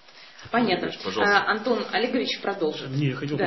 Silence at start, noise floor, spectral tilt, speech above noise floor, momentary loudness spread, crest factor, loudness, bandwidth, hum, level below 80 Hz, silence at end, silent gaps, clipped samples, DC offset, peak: 0.15 s; -46 dBFS; -5.5 dB/octave; 22 dB; 7 LU; 20 dB; -25 LUFS; 6.2 kHz; none; -64 dBFS; 0 s; none; under 0.1%; 0.2%; -4 dBFS